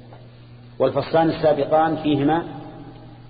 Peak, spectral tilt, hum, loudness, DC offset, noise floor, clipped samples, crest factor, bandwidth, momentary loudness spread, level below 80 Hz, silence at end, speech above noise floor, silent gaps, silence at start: -6 dBFS; -11.5 dB/octave; none; -20 LUFS; under 0.1%; -43 dBFS; under 0.1%; 16 dB; 5 kHz; 20 LU; -50 dBFS; 0 s; 24 dB; none; 0.05 s